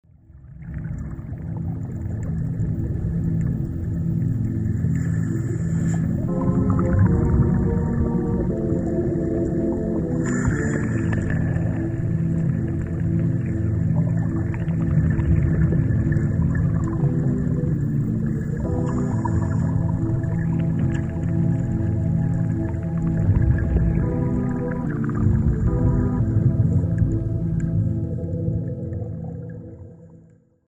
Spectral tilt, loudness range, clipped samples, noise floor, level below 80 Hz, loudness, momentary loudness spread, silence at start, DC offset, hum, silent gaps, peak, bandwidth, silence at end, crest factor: -10 dB/octave; 4 LU; under 0.1%; -52 dBFS; -32 dBFS; -23 LUFS; 7 LU; 0.3 s; under 0.1%; none; none; -6 dBFS; 8.2 kHz; 0.55 s; 16 dB